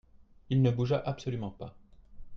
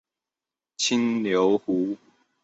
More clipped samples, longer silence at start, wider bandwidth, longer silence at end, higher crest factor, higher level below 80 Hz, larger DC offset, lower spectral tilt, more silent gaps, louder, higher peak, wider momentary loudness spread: neither; second, 0.2 s vs 0.8 s; second, 6.6 kHz vs 8.2 kHz; second, 0 s vs 0.5 s; about the same, 18 dB vs 16 dB; first, -54 dBFS vs -68 dBFS; neither; first, -8.5 dB/octave vs -4 dB/octave; neither; second, -31 LUFS vs -24 LUFS; second, -14 dBFS vs -10 dBFS; first, 17 LU vs 7 LU